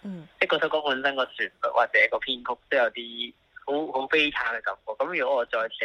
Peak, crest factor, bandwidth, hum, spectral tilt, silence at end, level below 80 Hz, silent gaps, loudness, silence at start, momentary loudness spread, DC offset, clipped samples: -6 dBFS; 20 dB; 10.5 kHz; none; -4.5 dB/octave; 0 s; -64 dBFS; none; -26 LUFS; 0.05 s; 11 LU; under 0.1%; under 0.1%